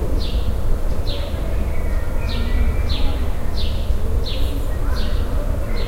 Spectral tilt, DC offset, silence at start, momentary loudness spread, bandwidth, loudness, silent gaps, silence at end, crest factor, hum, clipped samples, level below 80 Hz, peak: -6 dB/octave; under 0.1%; 0 s; 3 LU; 15.5 kHz; -24 LUFS; none; 0 s; 12 dB; none; under 0.1%; -20 dBFS; -6 dBFS